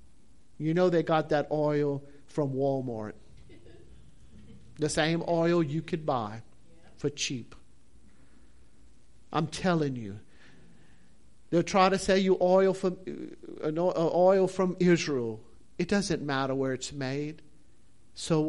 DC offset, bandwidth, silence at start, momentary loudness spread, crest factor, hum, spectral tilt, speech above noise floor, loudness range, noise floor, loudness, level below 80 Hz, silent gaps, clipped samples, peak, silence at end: 0.4%; 11.5 kHz; 0.6 s; 16 LU; 18 dB; none; -5.5 dB/octave; 35 dB; 9 LU; -63 dBFS; -28 LUFS; -58 dBFS; none; under 0.1%; -10 dBFS; 0 s